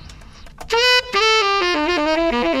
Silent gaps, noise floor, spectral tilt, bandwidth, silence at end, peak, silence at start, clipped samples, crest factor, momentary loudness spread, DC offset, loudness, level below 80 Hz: none; -39 dBFS; -2 dB/octave; 15.5 kHz; 0 s; -4 dBFS; 0.05 s; under 0.1%; 14 dB; 4 LU; under 0.1%; -16 LUFS; -40 dBFS